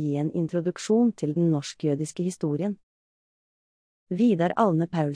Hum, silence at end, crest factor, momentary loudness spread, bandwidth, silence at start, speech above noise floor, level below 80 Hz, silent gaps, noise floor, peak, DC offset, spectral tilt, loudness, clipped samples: none; 0 s; 16 dB; 7 LU; 10.5 kHz; 0 s; over 65 dB; -70 dBFS; 2.83-4.07 s; under -90 dBFS; -8 dBFS; under 0.1%; -7 dB/octave; -25 LUFS; under 0.1%